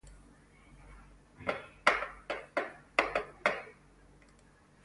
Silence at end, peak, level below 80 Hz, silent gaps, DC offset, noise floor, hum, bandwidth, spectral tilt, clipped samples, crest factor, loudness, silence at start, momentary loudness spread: 1.15 s; -8 dBFS; -60 dBFS; none; under 0.1%; -62 dBFS; none; 11.5 kHz; -3 dB/octave; under 0.1%; 30 dB; -34 LUFS; 0.05 s; 11 LU